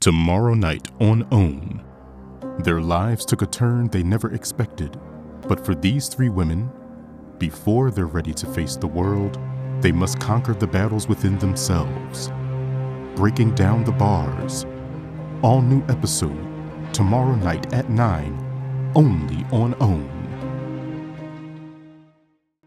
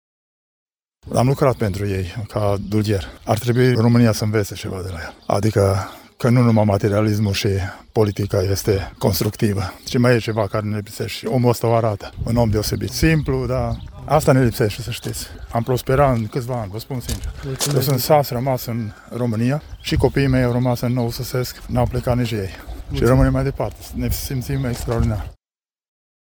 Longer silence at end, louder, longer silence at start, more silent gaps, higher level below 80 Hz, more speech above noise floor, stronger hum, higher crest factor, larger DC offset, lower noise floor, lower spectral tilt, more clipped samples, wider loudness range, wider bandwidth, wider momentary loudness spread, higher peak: second, 0.75 s vs 1.05 s; about the same, -21 LUFS vs -20 LUFS; second, 0 s vs 1.05 s; neither; about the same, -38 dBFS vs -34 dBFS; second, 44 dB vs over 71 dB; neither; about the same, 18 dB vs 18 dB; neither; second, -63 dBFS vs under -90 dBFS; about the same, -6 dB/octave vs -6 dB/octave; neither; about the same, 3 LU vs 3 LU; second, 15 kHz vs over 20 kHz; first, 14 LU vs 11 LU; about the same, -2 dBFS vs 0 dBFS